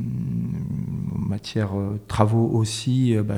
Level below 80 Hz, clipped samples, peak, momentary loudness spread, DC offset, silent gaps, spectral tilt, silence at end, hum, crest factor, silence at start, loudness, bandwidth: -46 dBFS; under 0.1%; -2 dBFS; 8 LU; under 0.1%; none; -7 dB/octave; 0 s; none; 20 dB; 0 s; -24 LUFS; 12 kHz